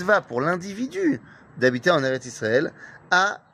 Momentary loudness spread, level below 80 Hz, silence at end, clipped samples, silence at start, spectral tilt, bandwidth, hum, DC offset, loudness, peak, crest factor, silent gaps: 7 LU; -64 dBFS; 0.15 s; under 0.1%; 0 s; -5 dB/octave; 15 kHz; none; under 0.1%; -23 LUFS; -4 dBFS; 20 dB; none